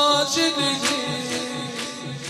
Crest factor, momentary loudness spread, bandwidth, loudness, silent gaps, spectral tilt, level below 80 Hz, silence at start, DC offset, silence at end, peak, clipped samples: 16 dB; 11 LU; 16 kHz; -22 LUFS; none; -2.5 dB/octave; -64 dBFS; 0 s; under 0.1%; 0 s; -6 dBFS; under 0.1%